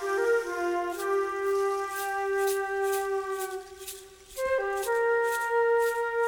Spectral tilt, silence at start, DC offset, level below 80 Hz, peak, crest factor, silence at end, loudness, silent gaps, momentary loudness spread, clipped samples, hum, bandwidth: -2 dB/octave; 0 s; under 0.1%; -62 dBFS; -16 dBFS; 12 dB; 0 s; -28 LUFS; none; 11 LU; under 0.1%; none; over 20 kHz